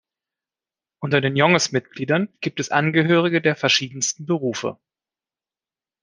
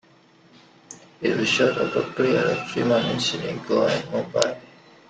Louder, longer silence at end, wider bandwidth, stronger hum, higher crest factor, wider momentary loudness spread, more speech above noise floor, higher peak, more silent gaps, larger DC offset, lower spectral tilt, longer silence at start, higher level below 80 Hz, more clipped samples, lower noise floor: first, -20 LUFS vs -23 LUFS; first, 1.3 s vs 0.45 s; first, 10.5 kHz vs 9.4 kHz; neither; about the same, 20 dB vs 22 dB; about the same, 10 LU vs 8 LU; first, over 70 dB vs 32 dB; about the same, -2 dBFS vs -2 dBFS; neither; neither; about the same, -4 dB/octave vs -4.5 dB/octave; about the same, 1 s vs 0.9 s; second, -68 dBFS vs -62 dBFS; neither; first, under -90 dBFS vs -55 dBFS